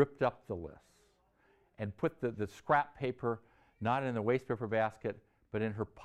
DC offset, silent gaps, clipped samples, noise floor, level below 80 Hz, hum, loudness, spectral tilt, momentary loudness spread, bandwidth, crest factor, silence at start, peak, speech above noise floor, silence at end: under 0.1%; none; under 0.1%; -70 dBFS; -66 dBFS; none; -36 LUFS; -7.5 dB/octave; 12 LU; 12.5 kHz; 20 dB; 0 s; -16 dBFS; 35 dB; 0 s